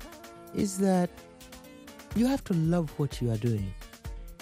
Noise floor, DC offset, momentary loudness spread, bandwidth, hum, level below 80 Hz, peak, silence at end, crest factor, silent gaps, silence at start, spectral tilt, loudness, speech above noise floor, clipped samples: -49 dBFS; under 0.1%; 21 LU; 16 kHz; none; -46 dBFS; -14 dBFS; 0.05 s; 16 dB; none; 0 s; -7 dB/octave; -29 LUFS; 21 dB; under 0.1%